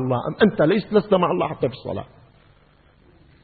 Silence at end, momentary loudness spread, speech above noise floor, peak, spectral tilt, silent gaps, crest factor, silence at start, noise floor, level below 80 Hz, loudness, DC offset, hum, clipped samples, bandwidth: 1.4 s; 13 LU; 35 dB; -2 dBFS; -11.5 dB/octave; none; 22 dB; 0 s; -55 dBFS; -54 dBFS; -21 LUFS; under 0.1%; none; under 0.1%; 4.8 kHz